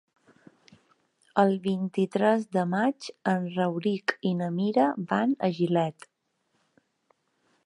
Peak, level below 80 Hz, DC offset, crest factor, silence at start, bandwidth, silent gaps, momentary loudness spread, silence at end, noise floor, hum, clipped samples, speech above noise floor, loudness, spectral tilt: -8 dBFS; -76 dBFS; under 0.1%; 20 dB; 1.35 s; 11 kHz; none; 5 LU; 1.75 s; -74 dBFS; none; under 0.1%; 48 dB; -27 LUFS; -7 dB/octave